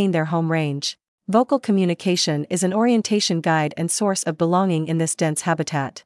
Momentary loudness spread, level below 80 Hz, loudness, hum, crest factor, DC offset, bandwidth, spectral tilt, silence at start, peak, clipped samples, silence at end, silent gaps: 4 LU; -72 dBFS; -21 LUFS; none; 16 dB; under 0.1%; 12 kHz; -5 dB/octave; 0 s; -4 dBFS; under 0.1%; 0.05 s; 1.08-1.18 s